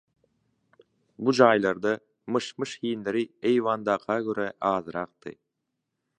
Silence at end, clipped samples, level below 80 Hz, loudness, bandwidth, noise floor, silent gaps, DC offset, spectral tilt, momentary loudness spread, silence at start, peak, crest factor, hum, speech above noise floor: 0.85 s; under 0.1%; -70 dBFS; -26 LUFS; 9.8 kHz; -82 dBFS; none; under 0.1%; -5.5 dB/octave; 14 LU; 1.2 s; -2 dBFS; 24 dB; none; 56 dB